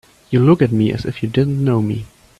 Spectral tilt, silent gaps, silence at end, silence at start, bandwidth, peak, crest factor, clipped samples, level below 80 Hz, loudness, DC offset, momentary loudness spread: -9 dB/octave; none; 0.35 s; 0.3 s; 12 kHz; 0 dBFS; 16 dB; under 0.1%; -46 dBFS; -16 LUFS; under 0.1%; 10 LU